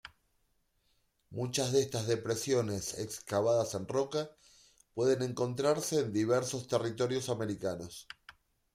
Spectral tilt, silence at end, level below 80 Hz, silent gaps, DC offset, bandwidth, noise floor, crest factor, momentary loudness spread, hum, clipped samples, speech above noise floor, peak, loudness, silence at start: -5 dB/octave; 0.45 s; -68 dBFS; none; under 0.1%; 16 kHz; -75 dBFS; 18 dB; 13 LU; none; under 0.1%; 43 dB; -16 dBFS; -33 LUFS; 0.05 s